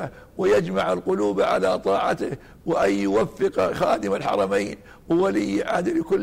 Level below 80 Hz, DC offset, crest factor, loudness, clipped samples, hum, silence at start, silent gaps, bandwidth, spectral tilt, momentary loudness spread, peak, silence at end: -52 dBFS; under 0.1%; 12 dB; -23 LUFS; under 0.1%; none; 0 s; none; 15.5 kHz; -6 dB/octave; 6 LU; -10 dBFS; 0 s